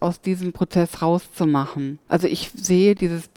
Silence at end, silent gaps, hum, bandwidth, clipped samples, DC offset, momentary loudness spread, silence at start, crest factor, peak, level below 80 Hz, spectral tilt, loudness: 0.1 s; none; none; 18 kHz; under 0.1%; under 0.1%; 8 LU; 0 s; 16 dB; -4 dBFS; -50 dBFS; -6 dB/octave; -21 LUFS